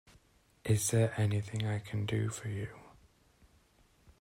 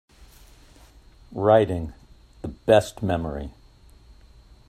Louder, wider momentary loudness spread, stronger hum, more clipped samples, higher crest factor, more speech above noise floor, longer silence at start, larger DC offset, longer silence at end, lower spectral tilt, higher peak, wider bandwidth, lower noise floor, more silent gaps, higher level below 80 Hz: second, -34 LUFS vs -22 LUFS; second, 13 LU vs 20 LU; neither; neither; about the same, 18 dB vs 22 dB; first, 35 dB vs 30 dB; second, 0.65 s vs 1.3 s; neither; first, 1.35 s vs 1.2 s; about the same, -5.5 dB/octave vs -6.5 dB/octave; second, -16 dBFS vs -4 dBFS; first, 16 kHz vs 14.5 kHz; first, -67 dBFS vs -51 dBFS; neither; second, -62 dBFS vs -46 dBFS